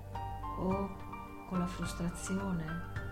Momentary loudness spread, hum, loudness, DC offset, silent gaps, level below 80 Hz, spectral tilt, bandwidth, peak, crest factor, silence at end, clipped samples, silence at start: 8 LU; none; -38 LUFS; under 0.1%; none; -48 dBFS; -6 dB/octave; 16 kHz; -22 dBFS; 16 dB; 0 s; under 0.1%; 0 s